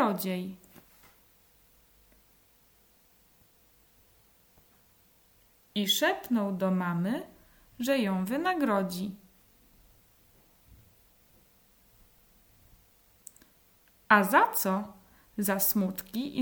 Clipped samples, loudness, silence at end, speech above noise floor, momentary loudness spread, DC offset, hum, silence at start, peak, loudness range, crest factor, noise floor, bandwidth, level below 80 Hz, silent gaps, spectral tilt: under 0.1%; -28 LUFS; 0 s; 35 dB; 23 LU; under 0.1%; none; 0 s; -6 dBFS; 11 LU; 26 dB; -63 dBFS; over 20 kHz; -68 dBFS; none; -4.5 dB/octave